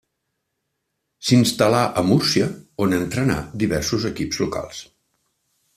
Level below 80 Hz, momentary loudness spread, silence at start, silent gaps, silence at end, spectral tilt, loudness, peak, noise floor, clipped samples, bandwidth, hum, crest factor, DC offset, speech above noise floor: -48 dBFS; 9 LU; 1.2 s; none; 0.95 s; -5 dB/octave; -20 LUFS; -2 dBFS; -76 dBFS; under 0.1%; 15 kHz; none; 20 dB; under 0.1%; 57 dB